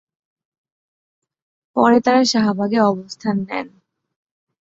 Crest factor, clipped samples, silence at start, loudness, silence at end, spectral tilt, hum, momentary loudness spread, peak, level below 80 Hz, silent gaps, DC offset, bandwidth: 18 dB; under 0.1%; 1.75 s; -17 LUFS; 1 s; -5 dB/octave; none; 13 LU; -2 dBFS; -62 dBFS; none; under 0.1%; 8 kHz